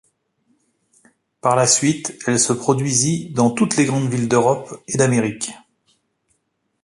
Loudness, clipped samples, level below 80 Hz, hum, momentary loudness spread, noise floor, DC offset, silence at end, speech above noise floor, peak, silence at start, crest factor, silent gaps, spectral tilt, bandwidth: -18 LUFS; under 0.1%; -58 dBFS; none; 9 LU; -70 dBFS; under 0.1%; 1.25 s; 53 dB; -2 dBFS; 1.45 s; 18 dB; none; -4.5 dB/octave; 11.5 kHz